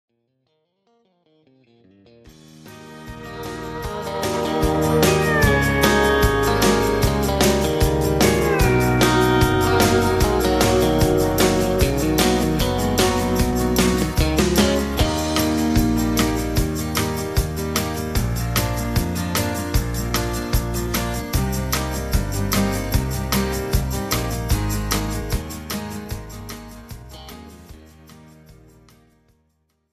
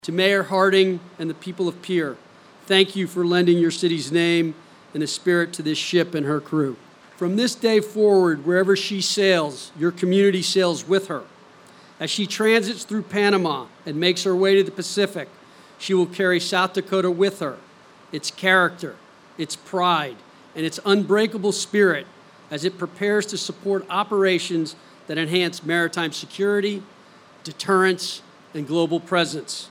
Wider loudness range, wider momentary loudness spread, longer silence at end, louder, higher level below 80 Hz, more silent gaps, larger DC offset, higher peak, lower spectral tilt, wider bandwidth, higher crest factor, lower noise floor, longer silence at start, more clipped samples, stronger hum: first, 12 LU vs 4 LU; about the same, 13 LU vs 13 LU; first, 1.4 s vs 0.05 s; about the same, -20 LUFS vs -21 LUFS; first, -28 dBFS vs -76 dBFS; neither; neither; about the same, -2 dBFS vs -2 dBFS; about the same, -5 dB/octave vs -4.5 dB/octave; about the same, 15.5 kHz vs 16 kHz; about the same, 18 dB vs 20 dB; first, -69 dBFS vs -49 dBFS; first, 2.55 s vs 0.05 s; neither; neither